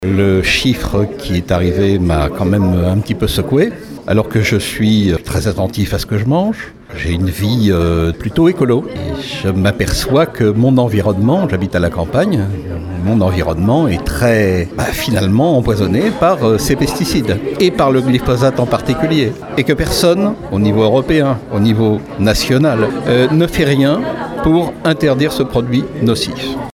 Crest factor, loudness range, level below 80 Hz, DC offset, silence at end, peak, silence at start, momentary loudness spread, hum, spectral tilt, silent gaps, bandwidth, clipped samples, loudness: 14 dB; 2 LU; -30 dBFS; under 0.1%; 0.05 s; 0 dBFS; 0 s; 6 LU; none; -6 dB/octave; none; 18.5 kHz; under 0.1%; -14 LUFS